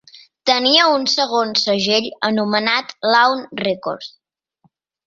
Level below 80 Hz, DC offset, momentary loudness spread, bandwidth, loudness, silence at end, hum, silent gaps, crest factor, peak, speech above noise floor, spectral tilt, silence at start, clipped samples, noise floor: -64 dBFS; under 0.1%; 11 LU; 7.8 kHz; -16 LUFS; 1 s; none; none; 18 dB; -2 dBFS; 45 dB; -3 dB/octave; 0.45 s; under 0.1%; -62 dBFS